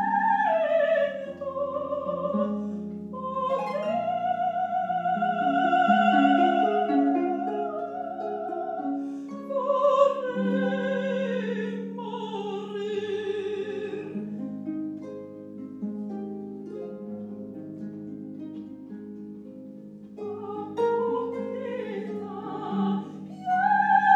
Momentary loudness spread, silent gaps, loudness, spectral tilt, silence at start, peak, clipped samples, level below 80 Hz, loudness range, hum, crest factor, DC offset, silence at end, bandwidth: 17 LU; none; -27 LUFS; -7 dB/octave; 0 s; -6 dBFS; under 0.1%; -74 dBFS; 14 LU; none; 20 dB; under 0.1%; 0 s; 7.8 kHz